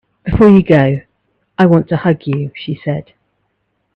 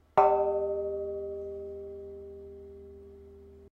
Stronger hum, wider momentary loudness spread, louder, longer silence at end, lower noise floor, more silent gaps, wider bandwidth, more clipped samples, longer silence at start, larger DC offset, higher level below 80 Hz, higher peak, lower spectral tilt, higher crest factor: neither; second, 14 LU vs 26 LU; first, -13 LUFS vs -30 LUFS; first, 0.95 s vs 0.05 s; first, -66 dBFS vs -51 dBFS; neither; about the same, 5.6 kHz vs 5.8 kHz; neither; about the same, 0.25 s vs 0.15 s; neither; first, -36 dBFS vs -58 dBFS; first, 0 dBFS vs -8 dBFS; first, -9.5 dB/octave vs -8 dB/octave; second, 14 dB vs 24 dB